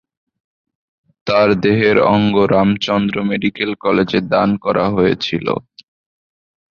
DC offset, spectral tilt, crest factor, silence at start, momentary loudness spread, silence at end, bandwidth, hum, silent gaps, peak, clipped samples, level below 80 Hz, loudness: under 0.1%; -7 dB/octave; 16 dB; 1.25 s; 7 LU; 1.15 s; 6.8 kHz; none; none; -2 dBFS; under 0.1%; -46 dBFS; -15 LUFS